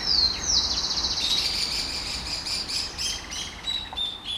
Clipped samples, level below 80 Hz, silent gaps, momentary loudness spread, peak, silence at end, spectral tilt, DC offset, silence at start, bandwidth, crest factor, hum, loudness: under 0.1%; -44 dBFS; none; 9 LU; -10 dBFS; 0 s; -0.5 dB/octave; under 0.1%; 0 s; 17.5 kHz; 18 dB; none; -24 LUFS